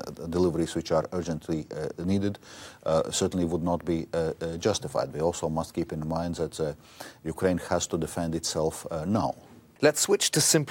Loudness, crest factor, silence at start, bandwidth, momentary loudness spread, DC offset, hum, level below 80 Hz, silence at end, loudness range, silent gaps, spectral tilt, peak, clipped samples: -28 LUFS; 22 dB; 0 s; 17.5 kHz; 10 LU; under 0.1%; none; -56 dBFS; 0 s; 3 LU; none; -4 dB/octave; -6 dBFS; under 0.1%